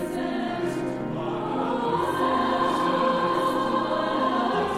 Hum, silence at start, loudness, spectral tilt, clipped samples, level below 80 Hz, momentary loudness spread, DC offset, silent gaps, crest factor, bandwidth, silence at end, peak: none; 0 s; -25 LUFS; -5.5 dB/octave; under 0.1%; -54 dBFS; 6 LU; under 0.1%; none; 14 dB; 15.5 kHz; 0 s; -10 dBFS